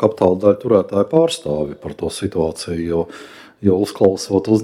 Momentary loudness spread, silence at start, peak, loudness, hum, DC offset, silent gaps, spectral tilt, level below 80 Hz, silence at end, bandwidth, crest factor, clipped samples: 10 LU; 0 s; 0 dBFS; -18 LUFS; none; under 0.1%; none; -6.5 dB/octave; -48 dBFS; 0 s; 14.5 kHz; 18 dB; under 0.1%